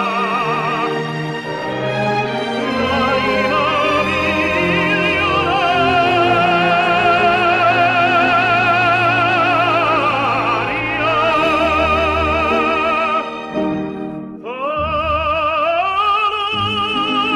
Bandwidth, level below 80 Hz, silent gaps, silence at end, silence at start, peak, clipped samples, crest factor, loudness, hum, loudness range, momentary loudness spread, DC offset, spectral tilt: 13 kHz; -38 dBFS; none; 0 s; 0 s; -4 dBFS; under 0.1%; 12 dB; -15 LUFS; none; 5 LU; 8 LU; under 0.1%; -5.5 dB/octave